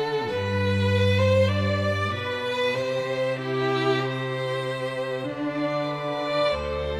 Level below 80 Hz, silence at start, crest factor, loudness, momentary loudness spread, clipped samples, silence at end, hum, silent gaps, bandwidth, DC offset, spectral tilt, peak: -48 dBFS; 0 s; 14 dB; -25 LUFS; 7 LU; under 0.1%; 0 s; none; none; 11.5 kHz; under 0.1%; -6.5 dB/octave; -10 dBFS